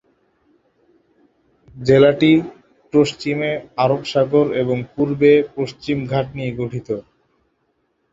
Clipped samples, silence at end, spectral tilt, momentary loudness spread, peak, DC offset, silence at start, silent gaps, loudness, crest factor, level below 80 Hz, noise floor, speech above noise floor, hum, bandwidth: under 0.1%; 1.1 s; -7 dB/octave; 13 LU; -2 dBFS; under 0.1%; 1.75 s; none; -18 LUFS; 18 dB; -52 dBFS; -67 dBFS; 50 dB; none; 7.8 kHz